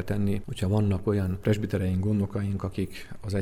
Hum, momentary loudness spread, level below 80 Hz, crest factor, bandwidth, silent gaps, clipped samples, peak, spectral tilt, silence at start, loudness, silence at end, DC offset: none; 7 LU; -46 dBFS; 16 dB; 14 kHz; none; under 0.1%; -10 dBFS; -8 dB/octave; 0 s; -28 LUFS; 0 s; under 0.1%